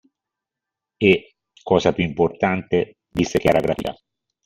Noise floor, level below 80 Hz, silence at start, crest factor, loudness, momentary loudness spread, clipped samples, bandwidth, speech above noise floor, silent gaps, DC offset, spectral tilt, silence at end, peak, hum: -86 dBFS; -48 dBFS; 1 s; 20 dB; -20 LUFS; 9 LU; under 0.1%; 15.5 kHz; 67 dB; none; under 0.1%; -6 dB/octave; 0.55 s; -2 dBFS; none